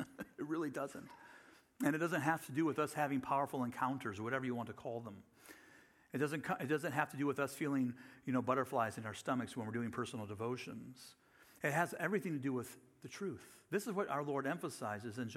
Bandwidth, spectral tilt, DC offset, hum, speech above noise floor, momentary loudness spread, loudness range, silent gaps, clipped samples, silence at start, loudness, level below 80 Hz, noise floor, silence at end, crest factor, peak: 16.5 kHz; -6 dB/octave; under 0.1%; none; 26 dB; 17 LU; 4 LU; none; under 0.1%; 0 s; -40 LUFS; -80 dBFS; -65 dBFS; 0 s; 22 dB; -18 dBFS